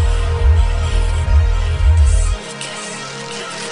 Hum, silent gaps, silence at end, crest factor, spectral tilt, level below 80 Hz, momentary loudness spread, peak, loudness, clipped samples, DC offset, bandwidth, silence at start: none; none; 0 s; 12 dB; -4.5 dB/octave; -16 dBFS; 11 LU; -4 dBFS; -18 LUFS; under 0.1%; under 0.1%; 10.5 kHz; 0 s